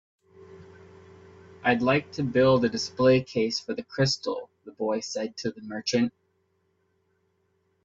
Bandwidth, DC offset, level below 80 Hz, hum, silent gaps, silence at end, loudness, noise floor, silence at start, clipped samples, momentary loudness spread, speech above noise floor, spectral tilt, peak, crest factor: 7.8 kHz; under 0.1%; -62 dBFS; none; none; 1.75 s; -26 LUFS; -71 dBFS; 0.4 s; under 0.1%; 12 LU; 46 dB; -5 dB/octave; -10 dBFS; 18 dB